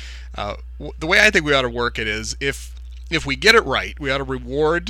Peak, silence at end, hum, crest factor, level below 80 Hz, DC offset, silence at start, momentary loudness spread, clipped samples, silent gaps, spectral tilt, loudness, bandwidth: 0 dBFS; 0 s; none; 20 dB; -34 dBFS; under 0.1%; 0 s; 19 LU; under 0.1%; none; -3.5 dB/octave; -18 LUFS; 17.5 kHz